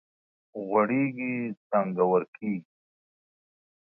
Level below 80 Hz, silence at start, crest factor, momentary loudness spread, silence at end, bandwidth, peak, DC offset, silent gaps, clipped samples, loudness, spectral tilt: -78 dBFS; 0.55 s; 20 dB; 11 LU; 1.35 s; 2.8 kHz; -10 dBFS; under 0.1%; 1.57-1.70 s, 2.28-2.33 s; under 0.1%; -28 LUFS; -12 dB/octave